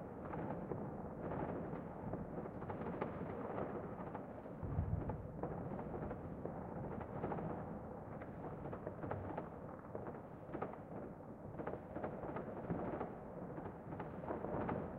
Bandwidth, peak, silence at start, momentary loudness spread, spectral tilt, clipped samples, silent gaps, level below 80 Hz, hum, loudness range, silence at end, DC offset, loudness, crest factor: 4.5 kHz; -24 dBFS; 0 s; 7 LU; -10.5 dB/octave; under 0.1%; none; -60 dBFS; none; 3 LU; 0 s; under 0.1%; -47 LUFS; 22 dB